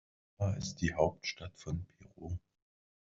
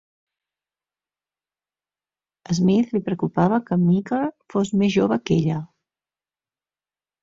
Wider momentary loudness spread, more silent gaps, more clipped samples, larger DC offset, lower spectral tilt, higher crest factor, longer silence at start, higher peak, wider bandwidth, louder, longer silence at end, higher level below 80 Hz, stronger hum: first, 13 LU vs 6 LU; neither; neither; neither; second, -5.5 dB/octave vs -7.5 dB/octave; first, 24 dB vs 18 dB; second, 0.4 s vs 2.5 s; second, -14 dBFS vs -6 dBFS; about the same, 7.6 kHz vs 7.6 kHz; second, -37 LUFS vs -21 LUFS; second, 0.75 s vs 1.55 s; about the same, -58 dBFS vs -58 dBFS; second, none vs 50 Hz at -45 dBFS